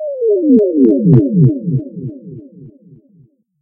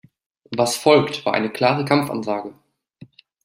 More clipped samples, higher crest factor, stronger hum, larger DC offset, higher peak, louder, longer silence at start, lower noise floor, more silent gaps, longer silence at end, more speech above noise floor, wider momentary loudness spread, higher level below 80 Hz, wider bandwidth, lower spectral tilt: first, 0.1% vs under 0.1%; second, 14 dB vs 20 dB; neither; neither; about the same, 0 dBFS vs -2 dBFS; first, -12 LUFS vs -20 LUFS; second, 0 s vs 0.5 s; about the same, -50 dBFS vs -48 dBFS; neither; about the same, 0.9 s vs 0.9 s; first, 38 dB vs 29 dB; first, 19 LU vs 12 LU; first, -48 dBFS vs -64 dBFS; second, 2 kHz vs 16 kHz; first, -14.5 dB/octave vs -4.5 dB/octave